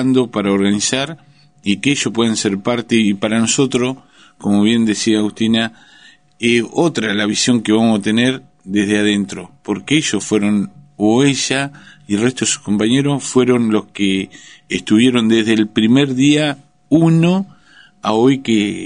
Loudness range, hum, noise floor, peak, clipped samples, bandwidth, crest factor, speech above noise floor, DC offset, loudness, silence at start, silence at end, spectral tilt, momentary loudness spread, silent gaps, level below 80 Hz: 2 LU; none; -47 dBFS; 0 dBFS; under 0.1%; 10.5 kHz; 16 dB; 32 dB; 0.2%; -15 LUFS; 0 s; 0 s; -4.5 dB/octave; 10 LU; none; -54 dBFS